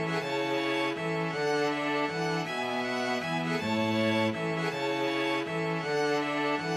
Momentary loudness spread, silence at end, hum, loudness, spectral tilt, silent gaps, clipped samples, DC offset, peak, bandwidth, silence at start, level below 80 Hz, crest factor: 3 LU; 0 s; none; -29 LUFS; -5 dB/octave; none; under 0.1%; under 0.1%; -16 dBFS; 15 kHz; 0 s; -74 dBFS; 14 dB